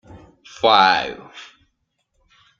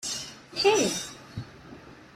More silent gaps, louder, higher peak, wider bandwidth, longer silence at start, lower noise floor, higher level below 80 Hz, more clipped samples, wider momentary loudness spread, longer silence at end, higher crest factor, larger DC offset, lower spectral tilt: neither; first, -16 LUFS vs -26 LUFS; first, -2 dBFS vs -10 dBFS; second, 7.4 kHz vs 16 kHz; first, 0.15 s vs 0 s; first, -71 dBFS vs -48 dBFS; about the same, -60 dBFS vs -60 dBFS; neither; about the same, 24 LU vs 25 LU; first, 1.15 s vs 0.1 s; about the same, 20 dB vs 20 dB; neither; about the same, -3 dB/octave vs -2.5 dB/octave